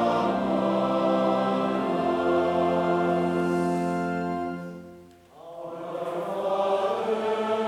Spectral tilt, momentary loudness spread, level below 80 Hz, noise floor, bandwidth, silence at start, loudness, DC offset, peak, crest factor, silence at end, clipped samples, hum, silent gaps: -7 dB/octave; 12 LU; -64 dBFS; -49 dBFS; 13.5 kHz; 0 s; -26 LUFS; under 0.1%; -12 dBFS; 14 dB; 0 s; under 0.1%; none; none